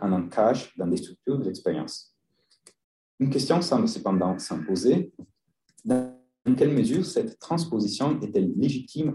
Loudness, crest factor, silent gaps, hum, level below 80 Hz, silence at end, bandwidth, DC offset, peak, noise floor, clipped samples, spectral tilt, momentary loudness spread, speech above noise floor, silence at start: -26 LUFS; 18 dB; 2.84-3.18 s; none; -66 dBFS; 0 s; 12 kHz; under 0.1%; -8 dBFS; -69 dBFS; under 0.1%; -6.5 dB/octave; 8 LU; 44 dB; 0 s